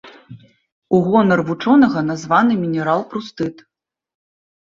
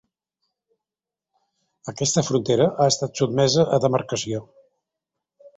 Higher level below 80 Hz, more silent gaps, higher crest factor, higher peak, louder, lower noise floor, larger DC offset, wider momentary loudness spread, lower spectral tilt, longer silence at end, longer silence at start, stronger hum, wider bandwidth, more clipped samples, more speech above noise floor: about the same, -58 dBFS vs -58 dBFS; first, 0.72-0.82 s vs none; about the same, 16 dB vs 20 dB; about the same, -2 dBFS vs -4 dBFS; first, -17 LUFS vs -21 LUFS; second, -42 dBFS vs -89 dBFS; neither; about the same, 13 LU vs 12 LU; first, -7 dB/octave vs -4.5 dB/octave; first, 1.25 s vs 0.1 s; second, 0.05 s vs 1.85 s; neither; second, 7.6 kHz vs 8.4 kHz; neither; second, 26 dB vs 68 dB